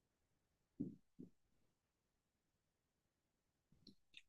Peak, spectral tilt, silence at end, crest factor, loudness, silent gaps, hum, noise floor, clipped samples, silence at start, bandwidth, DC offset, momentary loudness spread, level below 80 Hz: -34 dBFS; -6.5 dB/octave; 0.05 s; 28 dB; -56 LUFS; none; none; -90 dBFS; under 0.1%; 0.8 s; 7.4 kHz; under 0.1%; 17 LU; -88 dBFS